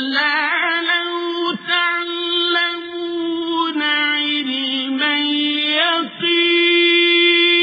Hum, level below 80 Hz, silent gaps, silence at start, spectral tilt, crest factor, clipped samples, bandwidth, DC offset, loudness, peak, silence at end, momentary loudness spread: none; -74 dBFS; none; 0 s; -4 dB/octave; 14 dB; under 0.1%; 5.2 kHz; under 0.1%; -16 LUFS; -4 dBFS; 0 s; 9 LU